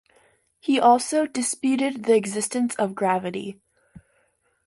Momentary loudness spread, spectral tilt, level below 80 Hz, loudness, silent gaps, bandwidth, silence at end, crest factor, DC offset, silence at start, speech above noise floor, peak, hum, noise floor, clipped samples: 13 LU; -4 dB/octave; -68 dBFS; -23 LUFS; none; 11.5 kHz; 1.15 s; 20 dB; under 0.1%; 0.65 s; 45 dB; -4 dBFS; none; -67 dBFS; under 0.1%